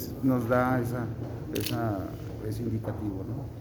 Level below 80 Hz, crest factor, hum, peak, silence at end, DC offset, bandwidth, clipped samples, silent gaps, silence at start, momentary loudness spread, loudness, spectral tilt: -50 dBFS; 18 dB; none; -12 dBFS; 0 s; under 0.1%; over 20 kHz; under 0.1%; none; 0 s; 11 LU; -31 LUFS; -7 dB/octave